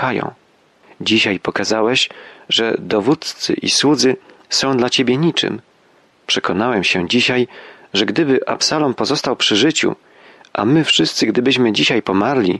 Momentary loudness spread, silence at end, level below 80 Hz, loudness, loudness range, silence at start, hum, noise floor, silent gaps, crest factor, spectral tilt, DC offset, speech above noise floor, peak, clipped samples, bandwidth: 8 LU; 0 s; -58 dBFS; -16 LUFS; 2 LU; 0 s; none; -53 dBFS; none; 14 dB; -3.5 dB/octave; under 0.1%; 37 dB; -2 dBFS; under 0.1%; 12.5 kHz